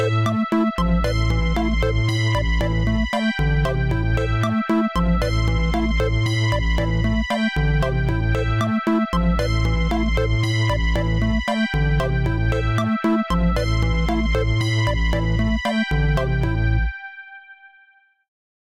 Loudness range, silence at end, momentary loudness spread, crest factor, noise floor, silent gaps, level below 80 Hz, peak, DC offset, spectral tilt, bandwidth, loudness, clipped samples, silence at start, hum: 1 LU; 1.1 s; 1 LU; 10 dB; -56 dBFS; none; -24 dBFS; -10 dBFS; 0.2%; -6.5 dB/octave; 11 kHz; -21 LUFS; under 0.1%; 0 s; none